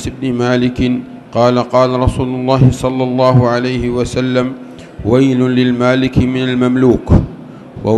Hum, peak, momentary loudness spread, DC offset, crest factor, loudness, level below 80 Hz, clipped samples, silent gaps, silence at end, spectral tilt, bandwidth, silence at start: none; 0 dBFS; 11 LU; under 0.1%; 12 dB; -13 LUFS; -30 dBFS; 0.4%; none; 0 s; -7.5 dB/octave; 11.5 kHz; 0 s